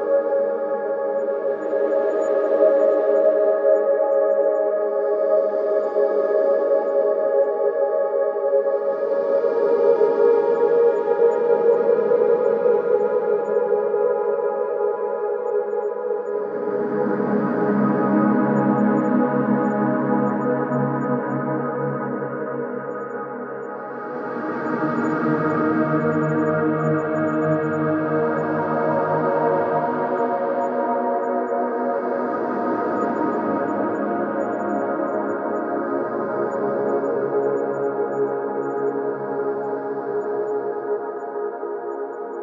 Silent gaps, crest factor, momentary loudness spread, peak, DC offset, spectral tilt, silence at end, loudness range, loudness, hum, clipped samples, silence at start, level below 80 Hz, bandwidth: none; 14 dB; 8 LU; -6 dBFS; under 0.1%; -9.5 dB/octave; 0 s; 6 LU; -21 LUFS; none; under 0.1%; 0 s; -70 dBFS; 7.4 kHz